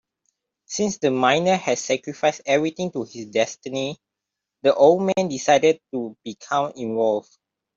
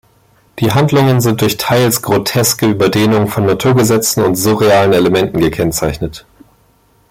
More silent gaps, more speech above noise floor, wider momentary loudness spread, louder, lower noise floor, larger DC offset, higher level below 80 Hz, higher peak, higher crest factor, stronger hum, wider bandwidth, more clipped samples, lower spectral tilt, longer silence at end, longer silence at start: neither; first, 63 dB vs 40 dB; first, 14 LU vs 5 LU; second, -22 LUFS vs -12 LUFS; first, -84 dBFS vs -52 dBFS; neither; second, -66 dBFS vs -40 dBFS; second, -4 dBFS vs 0 dBFS; first, 18 dB vs 12 dB; neither; second, 7.8 kHz vs 16.5 kHz; neither; about the same, -4 dB/octave vs -5 dB/octave; second, 0.55 s vs 0.9 s; first, 0.7 s vs 0.55 s